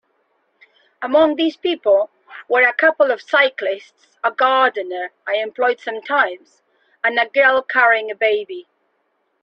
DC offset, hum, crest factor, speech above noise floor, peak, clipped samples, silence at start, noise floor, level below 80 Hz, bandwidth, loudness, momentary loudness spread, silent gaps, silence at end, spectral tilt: under 0.1%; none; 16 dB; 50 dB; -2 dBFS; under 0.1%; 1 s; -67 dBFS; -68 dBFS; 6.8 kHz; -17 LUFS; 12 LU; none; 0.8 s; -3.5 dB/octave